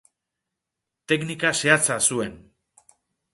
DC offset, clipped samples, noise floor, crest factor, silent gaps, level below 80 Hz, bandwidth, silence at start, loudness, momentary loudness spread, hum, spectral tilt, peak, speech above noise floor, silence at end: under 0.1%; under 0.1%; -84 dBFS; 24 dB; none; -62 dBFS; 12 kHz; 1.1 s; -21 LUFS; 10 LU; none; -2.5 dB/octave; -2 dBFS; 62 dB; 0.95 s